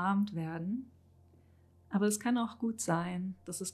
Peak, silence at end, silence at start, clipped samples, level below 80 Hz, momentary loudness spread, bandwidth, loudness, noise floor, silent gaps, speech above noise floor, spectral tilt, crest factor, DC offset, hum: -20 dBFS; 0 s; 0 s; under 0.1%; -68 dBFS; 9 LU; 14 kHz; -35 LUFS; -63 dBFS; none; 29 dB; -5 dB/octave; 16 dB; under 0.1%; none